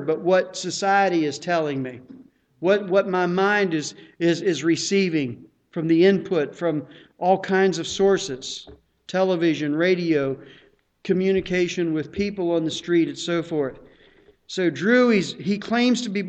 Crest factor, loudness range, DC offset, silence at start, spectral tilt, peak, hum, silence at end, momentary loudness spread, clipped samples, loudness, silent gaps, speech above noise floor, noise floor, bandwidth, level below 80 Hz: 16 dB; 2 LU; under 0.1%; 0 s; -5 dB/octave; -6 dBFS; none; 0 s; 11 LU; under 0.1%; -22 LUFS; none; 33 dB; -55 dBFS; 8.8 kHz; -58 dBFS